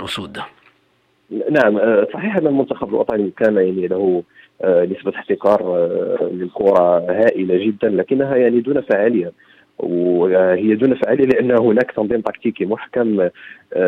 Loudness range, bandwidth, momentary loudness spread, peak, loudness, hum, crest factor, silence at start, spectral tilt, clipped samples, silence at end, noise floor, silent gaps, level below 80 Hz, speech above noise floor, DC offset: 2 LU; 10 kHz; 9 LU; -2 dBFS; -17 LUFS; none; 14 dB; 0 s; -7.5 dB/octave; under 0.1%; 0 s; -60 dBFS; none; -58 dBFS; 44 dB; under 0.1%